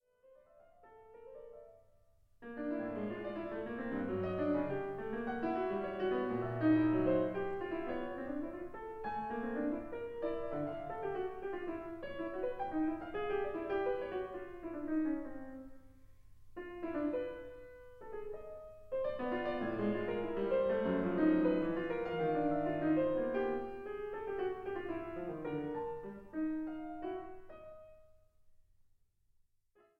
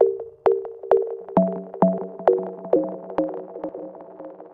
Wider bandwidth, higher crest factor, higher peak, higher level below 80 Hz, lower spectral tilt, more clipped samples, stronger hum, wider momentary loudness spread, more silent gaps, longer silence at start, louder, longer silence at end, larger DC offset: about the same, 4.9 kHz vs 4.8 kHz; about the same, 18 dB vs 22 dB; second, -20 dBFS vs -2 dBFS; about the same, -60 dBFS vs -62 dBFS; second, -9 dB/octave vs -11 dB/octave; neither; neither; about the same, 16 LU vs 15 LU; neither; first, 0.3 s vs 0 s; second, -38 LUFS vs -24 LUFS; first, 1.4 s vs 0.05 s; neither